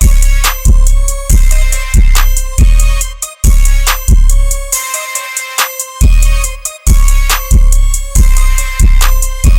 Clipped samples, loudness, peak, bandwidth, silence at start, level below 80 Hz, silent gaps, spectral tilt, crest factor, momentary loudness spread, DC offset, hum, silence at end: 0.4%; -12 LUFS; 0 dBFS; 17 kHz; 0 s; -8 dBFS; none; -3 dB/octave; 6 dB; 5 LU; under 0.1%; none; 0 s